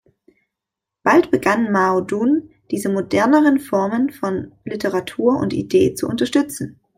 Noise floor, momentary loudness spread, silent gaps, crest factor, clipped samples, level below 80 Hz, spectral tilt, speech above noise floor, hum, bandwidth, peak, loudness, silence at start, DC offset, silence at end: -84 dBFS; 10 LU; none; 16 dB; under 0.1%; -54 dBFS; -5.5 dB/octave; 67 dB; none; 16 kHz; -2 dBFS; -18 LUFS; 1.05 s; under 0.1%; 0.25 s